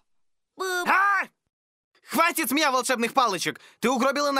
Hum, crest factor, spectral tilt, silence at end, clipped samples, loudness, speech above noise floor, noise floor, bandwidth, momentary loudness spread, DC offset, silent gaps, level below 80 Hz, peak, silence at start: none; 20 dB; -2 dB/octave; 0 s; under 0.1%; -23 LUFS; 51 dB; -75 dBFS; 16 kHz; 9 LU; under 0.1%; 1.53-1.91 s; -76 dBFS; -6 dBFS; 0.6 s